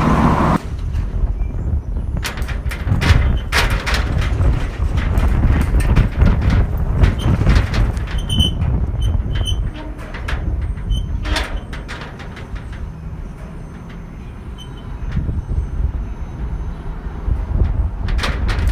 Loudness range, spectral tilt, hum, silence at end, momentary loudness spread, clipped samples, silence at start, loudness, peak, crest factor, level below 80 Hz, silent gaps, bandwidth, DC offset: 11 LU; -6 dB/octave; none; 0 s; 15 LU; under 0.1%; 0 s; -20 LUFS; 0 dBFS; 18 dB; -20 dBFS; none; 15 kHz; under 0.1%